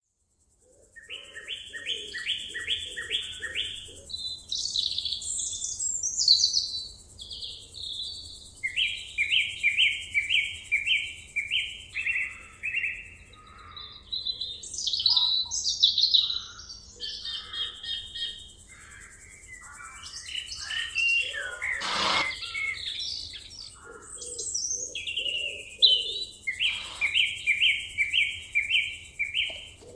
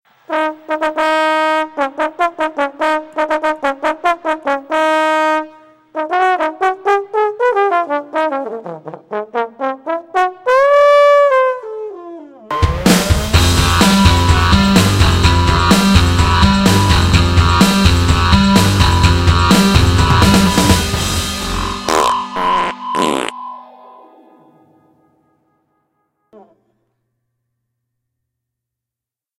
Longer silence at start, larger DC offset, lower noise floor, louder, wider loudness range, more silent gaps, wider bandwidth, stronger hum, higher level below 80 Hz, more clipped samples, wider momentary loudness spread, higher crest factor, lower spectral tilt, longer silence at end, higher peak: first, 0.95 s vs 0.3 s; neither; second, -71 dBFS vs -87 dBFS; second, -26 LUFS vs -13 LUFS; about the same, 8 LU vs 7 LU; neither; second, 11 kHz vs 16.5 kHz; neither; second, -58 dBFS vs -24 dBFS; neither; first, 20 LU vs 12 LU; first, 24 dB vs 14 dB; second, 1.5 dB/octave vs -5 dB/octave; second, 0 s vs 5.8 s; second, -6 dBFS vs 0 dBFS